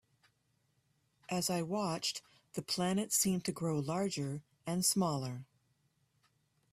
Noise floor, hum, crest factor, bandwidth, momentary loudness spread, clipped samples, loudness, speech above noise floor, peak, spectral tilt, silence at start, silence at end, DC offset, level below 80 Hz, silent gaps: -77 dBFS; none; 20 dB; 15.5 kHz; 13 LU; under 0.1%; -35 LUFS; 42 dB; -18 dBFS; -4 dB/octave; 1.3 s; 1.3 s; under 0.1%; -72 dBFS; none